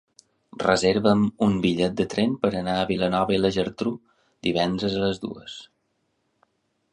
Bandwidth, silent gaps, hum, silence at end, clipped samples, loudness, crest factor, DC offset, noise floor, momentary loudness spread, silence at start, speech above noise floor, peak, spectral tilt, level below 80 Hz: 10.5 kHz; none; none; 1.25 s; under 0.1%; -23 LUFS; 22 dB; under 0.1%; -72 dBFS; 12 LU; 0.6 s; 49 dB; -2 dBFS; -6 dB/octave; -52 dBFS